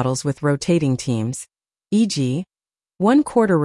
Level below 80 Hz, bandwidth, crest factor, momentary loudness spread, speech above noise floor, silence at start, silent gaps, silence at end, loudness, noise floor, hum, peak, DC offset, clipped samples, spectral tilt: -56 dBFS; 12 kHz; 14 dB; 12 LU; 55 dB; 0 s; none; 0 s; -20 LUFS; -74 dBFS; none; -6 dBFS; under 0.1%; under 0.1%; -6 dB/octave